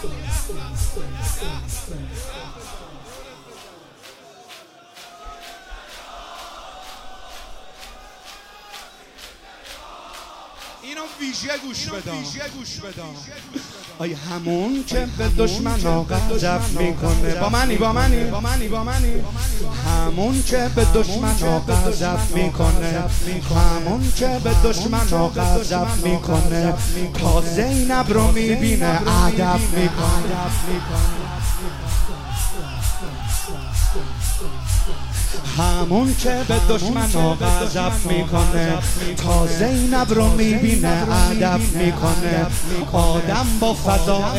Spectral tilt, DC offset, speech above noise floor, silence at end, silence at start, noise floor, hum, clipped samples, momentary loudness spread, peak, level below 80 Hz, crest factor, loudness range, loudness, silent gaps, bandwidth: -5 dB/octave; under 0.1%; 26 dB; 0 s; 0 s; -44 dBFS; none; under 0.1%; 20 LU; 0 dBFS; -24 dBFS; 18 dB; 19 LU; -21 LUFS; none; 16 kHz